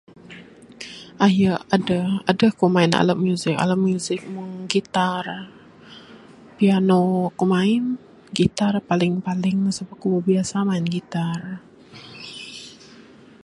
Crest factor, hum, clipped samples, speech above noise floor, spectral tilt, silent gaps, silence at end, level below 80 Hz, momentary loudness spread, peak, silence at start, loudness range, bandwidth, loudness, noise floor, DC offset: 20 dB; none; under 0.1%; 26 dB; -6 dB/octave; none; 0.7 s; -58 dBFS; 19 LU; -2 dBFS; 0.3 s; 5 LU; 11.5 kHz; -21 LUFS; -46 dBFS; under 0.1%